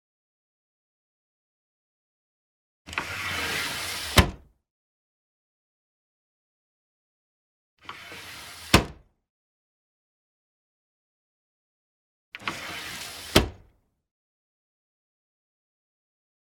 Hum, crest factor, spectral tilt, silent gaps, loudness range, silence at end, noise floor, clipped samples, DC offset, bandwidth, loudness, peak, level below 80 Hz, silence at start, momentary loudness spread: none; 34 dB; -3.5 dB/octave; 4.70-7.77 s, 9.30-12.32 s; 14 LU; 2.9 s; -63 dBFS; under 0.1%; under 0.1%; 19.5 kHz; -26 LUFS; 0 dBFS; -44 dBFS; 2.85 s; 18 LU